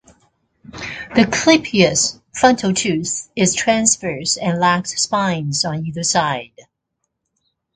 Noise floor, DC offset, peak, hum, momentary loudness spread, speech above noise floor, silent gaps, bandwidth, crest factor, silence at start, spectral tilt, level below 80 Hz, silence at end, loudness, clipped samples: -75 dBFS; under 0.1%; 0 dBFS; none; 8 LU; 58 dB; none; 9.6 kHz; 18 dB; 0.75 s; -3.5 dB/octave; -50 dBFS; 1.15 s; -17 LUFS; under 0.1%